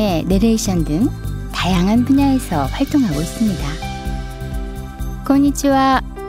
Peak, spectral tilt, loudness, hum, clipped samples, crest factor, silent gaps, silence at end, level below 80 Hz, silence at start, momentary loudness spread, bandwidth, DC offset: -2 dBFS; -5.5 dB/octave; -17 LUFS; none; under 0.1%; 14 dB; none; 0 s; -28 dBFS; 0 s; 13 LU; 16 kHz; under 0.1%